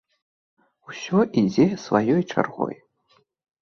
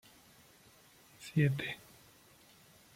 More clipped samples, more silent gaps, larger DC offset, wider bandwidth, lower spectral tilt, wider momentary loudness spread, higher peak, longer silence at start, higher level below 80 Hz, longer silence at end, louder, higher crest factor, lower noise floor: neither; neither; neither; second, 7 kHz vs 16 kHz; about the same, -7 dB/octave vs -6.5 dB/octave; second, 15 LU vs 27 LU; first, -4 dBFS vs -18 dBFS; second, 0.9 s vs 1.2 s; first, -62 dBFS vs -70 dBFS; second, 0.85 s vs 1.2 s; first, -22 LUFS vs -35 LUFS; about the same, 22 dB vs 22 dB; about the same, -64 dBFS vs -62 dBFS